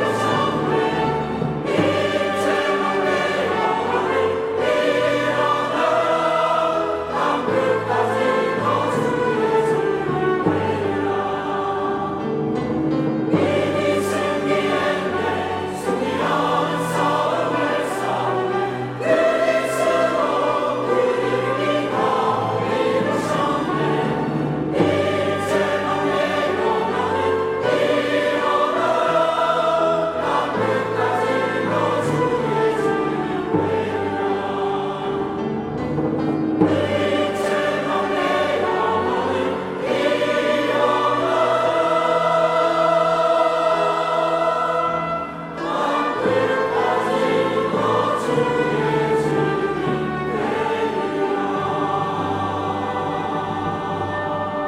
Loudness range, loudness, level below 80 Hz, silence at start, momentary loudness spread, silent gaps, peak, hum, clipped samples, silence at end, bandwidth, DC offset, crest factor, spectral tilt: 3 LU; -20 LUFS; -54 dBFS; 0 s; 5 LU; none; -2 dBFS; none; under 0.1%; 0 s; 15 kHz; under 0.1%; 16 dB; -5.5 dB/octave